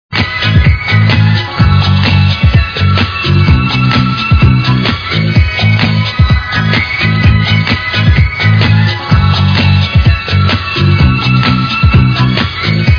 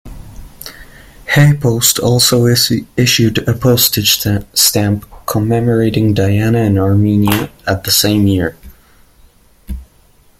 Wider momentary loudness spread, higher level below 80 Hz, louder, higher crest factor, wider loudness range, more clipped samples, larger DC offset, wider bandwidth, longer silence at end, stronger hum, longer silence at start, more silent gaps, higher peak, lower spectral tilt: second, 3 LU vs 18 LU; first, -18 dBFS vs -36 dBFS; first, -9 LUFS vs -12 LUFS; second, 8 dB vs 14 dB; second, 1 LU vs 4 LU; first, 0.8% vs under 0.1%; neither; second, 5.4 kHz vs 16.5 kHz; second, 0 s vs 0.55 s; neither; about the same, 0.1 s vs 0.05 s; neither; about the same, 0 dBFS vs 0 dBFS; first, -7 dB/octave vs -4.5 dB/octave